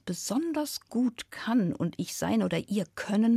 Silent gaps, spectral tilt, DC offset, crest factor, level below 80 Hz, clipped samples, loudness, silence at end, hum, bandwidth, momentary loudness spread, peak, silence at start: none; -5 dB/octave; under 0.1%; 14 dB; -68 dBFS; under 0.1%; -30 LUFS; 0 s; none; 15.5 kHz; 5 LU; -16 dBFS; 0.05 s